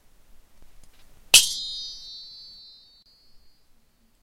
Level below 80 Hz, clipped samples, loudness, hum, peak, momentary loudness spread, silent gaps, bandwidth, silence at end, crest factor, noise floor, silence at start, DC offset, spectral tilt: -54 dBFS; under 0.1%; -18 LUFS; none; 0 dBFS; 27 LU; none; 16 kHz; 1.8 s; 28 dB; -60 dBFS; 0.35 s; under 0.1%; 3 dB/octave